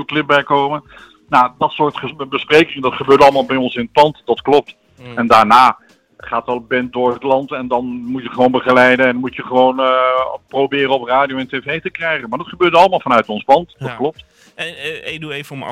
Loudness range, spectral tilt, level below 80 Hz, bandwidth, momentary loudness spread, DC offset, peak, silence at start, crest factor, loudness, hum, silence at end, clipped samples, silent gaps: 3 LU; -5.5 dB/octave; -52 dBFS; 15.5 kHz; 14 LU; under 0.1%; 0 dBFS; 0 s; 14 dB; -14 LUFS; none; 0 s; under 0.1%; none